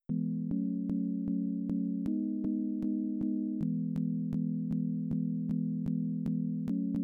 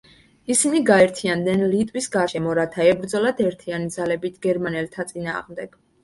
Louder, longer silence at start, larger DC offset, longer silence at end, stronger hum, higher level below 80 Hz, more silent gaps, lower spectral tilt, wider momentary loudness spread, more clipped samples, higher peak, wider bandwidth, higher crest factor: second, -34 LUFS vs -21 LUFS; second, 0.1 s vs 0.5 s; neither; second, 0 s vs 0.35 s; neither; about the same, -62 dBFS vs -58 dBFS; neither; first, -12 dB/octave vs -4.5 dB/octave; second, 0 LU vs 13 LU; neither; second, -22 dBFS vs -2 dBFS; second, 2.5 kHz vs 11.5 kHz; second, 10 dB vs 20 dB